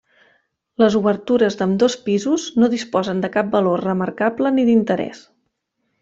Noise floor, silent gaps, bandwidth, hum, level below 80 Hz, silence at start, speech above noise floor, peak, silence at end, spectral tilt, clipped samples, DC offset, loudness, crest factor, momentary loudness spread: -72 dBFS; none; 7.8 kHz; none; -60 dBFS; 0.8 s; 55 dB; -2 dBFS; 0.85 s; -6 dB/octave; under 0.1%; under 0.1%; -18 LUFS; 16 dB; 6 LU